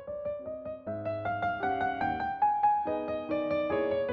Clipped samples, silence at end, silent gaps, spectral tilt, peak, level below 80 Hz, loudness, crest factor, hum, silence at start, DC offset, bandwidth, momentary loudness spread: under 0.1%; 0 s; none; -4.5 dB/octave; -16 dBFS; -60 dBFS; -31 LUFS; 14 dB; none; 0 s; under 0.1%; 5.8 kHz; 10 LU